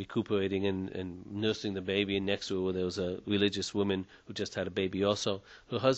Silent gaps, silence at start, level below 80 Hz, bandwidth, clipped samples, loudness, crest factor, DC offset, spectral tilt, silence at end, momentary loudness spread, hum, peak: none; 0 s; -64 dBFS; 8.2 kHz; under 0.1%; -33 LUFS; 20 dB; under 0.1%; -5 dB/octave; 0 s; 9 LU; none; -12 dBFS